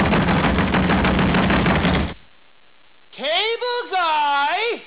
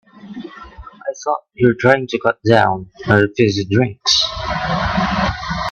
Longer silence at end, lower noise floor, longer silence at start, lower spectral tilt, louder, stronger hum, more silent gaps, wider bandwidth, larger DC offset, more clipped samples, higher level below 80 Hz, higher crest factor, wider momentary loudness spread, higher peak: about the same, 0 s vs 0 s; first, -55 dBFS vs -37 dBFS; second, 0 s vs 0.15 s; first, -10 dB/octave vs -5 dB/octave; second, -19 LUFS vs -16 LUFS; neither; neither; second, 4 kHz vs 8.4 kHz; first, 0.4% vs under 0.1%; neither; first, -32 dBFS vs -38 dBFS; second, 10 dB vs 18 dB; second, 5 LU vs 18 LU; second, -8 dBFS vs 0 dBFS